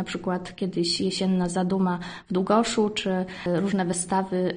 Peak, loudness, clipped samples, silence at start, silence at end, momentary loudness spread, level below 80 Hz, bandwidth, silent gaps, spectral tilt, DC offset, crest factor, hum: -8 dBFS; -25 LUFS; under 0.1%; 0 s; 0 s; 7 LU; -56 dBFS; 10 kHz; none; -5 dB/octave; under 0.1%; 18 dB; none